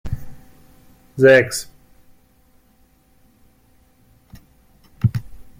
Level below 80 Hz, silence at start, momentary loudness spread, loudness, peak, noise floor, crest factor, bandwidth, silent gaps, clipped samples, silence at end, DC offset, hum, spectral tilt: -44 dBFS; 0.05 s; 23 LU; -17 LUFS; -2 dBFS; -56 dBFS; 22 dB; 16 kHz; none; under 0.1%; 0.2 s; under 0.1%; none; -5.5 dB/octave